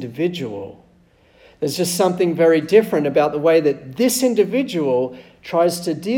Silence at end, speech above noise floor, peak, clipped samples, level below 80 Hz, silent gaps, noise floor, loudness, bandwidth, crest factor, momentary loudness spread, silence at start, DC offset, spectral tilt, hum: 0 s; 36 dB; -2 dBFS; under 0.1%; -60 dBFS; none; -54 dBFS; -18 LUFS; 18 kHz; 16 dB; 12 LU; 0 s; under 0.1%; -5 dB/octave; none